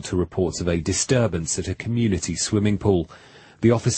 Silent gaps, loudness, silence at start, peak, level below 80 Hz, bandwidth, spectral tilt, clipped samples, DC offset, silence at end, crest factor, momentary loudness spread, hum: none; -22 LUFS; 0 s; -4 dBFS; -42 dBFS; 8.8 kHz; -5 dB/octave; under 0.1%; under 0.1%; 0 s; 18 dB; 5 LU; none